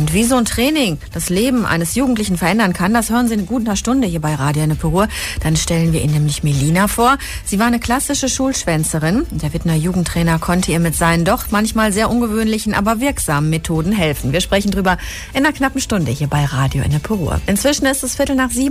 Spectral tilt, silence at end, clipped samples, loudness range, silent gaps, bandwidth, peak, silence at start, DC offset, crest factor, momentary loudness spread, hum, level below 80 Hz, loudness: -5 dB/octave; 0 s; under 0.1%; 1 LU; none; 15.5 kHz; -2 dBFS; 0 s; under 0.1%; 14 dB; 4 LU; none; -30 dBFS; -16 LUFS